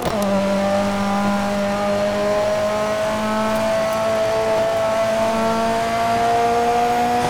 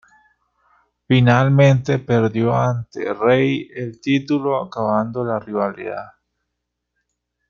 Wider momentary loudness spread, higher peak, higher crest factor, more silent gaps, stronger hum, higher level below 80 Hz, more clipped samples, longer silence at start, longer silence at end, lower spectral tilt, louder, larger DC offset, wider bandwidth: second, 3 LU vs 12 LU; second, -8 dBFS vs -2 dBFS; second, 10 dB vs 18 dB; neither; second, none vs 60 Hz at -45 dBFS; first, -44 dBFS vs -54 dBFS; neither; second, 0 s vs 1.1 s; second, 0 s vs 1.45 s; second, -5 dB/octave vs -7.5 dB/octave; about the same, -19 LUFS vs -18 LUFS; first, 0.8% vs under 0.1%; first, over 20 kHz vs 7 kHz